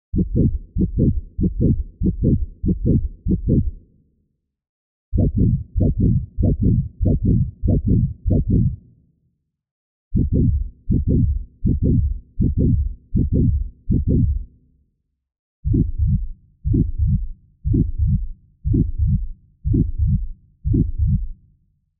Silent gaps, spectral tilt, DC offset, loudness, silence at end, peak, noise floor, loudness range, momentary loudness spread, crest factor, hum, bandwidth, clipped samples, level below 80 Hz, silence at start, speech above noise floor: 4.69-5.12 s, 9.71-10.11 s, 15.39-15.63 s; -21.5 dB/octave; under 0.1%; -21 LUFS; 0.65 s; -6 dBFS; -69 dBFS; 3 LU; 8 LU; 14 dB; none; 0.8 kHz; under 0.1%; -24 dBFS; 0.15 s; 51 dB